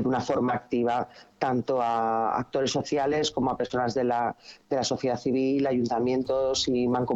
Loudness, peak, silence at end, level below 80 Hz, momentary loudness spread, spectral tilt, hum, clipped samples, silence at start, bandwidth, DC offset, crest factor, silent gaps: -27 LUFS; -10 dBFS; 0 s; -58 dBFS; 4 LU; -5 dB/octave; none; under 0.1%; 0 s; 8 kHz; under 0.1%; 16 dB; none